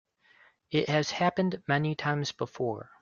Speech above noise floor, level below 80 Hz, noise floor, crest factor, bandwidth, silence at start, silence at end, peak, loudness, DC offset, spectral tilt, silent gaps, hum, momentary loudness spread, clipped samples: 33 dB; -68 dBFS; -62 dBFS; 20 dB; 7.2 kHz; 0.7 s; 0.2 s; -10 dBFS; -30 LUFS; under 0.1%; -5.5 dB/octave; none; none; 7 LU; under 0.1%